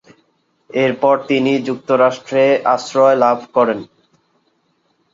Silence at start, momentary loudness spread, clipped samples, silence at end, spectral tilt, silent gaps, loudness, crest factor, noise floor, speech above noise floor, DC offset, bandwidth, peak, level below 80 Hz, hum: 0.75 s; 5 LU; under 0.1%; 1.3 s; -5.5 dB/octave; none; -15 LUFS; 16 dB; -63 dBFS; 48 dB; under 0.1%; 7.6 kHz; -2 dBFS; -64 dBFS; none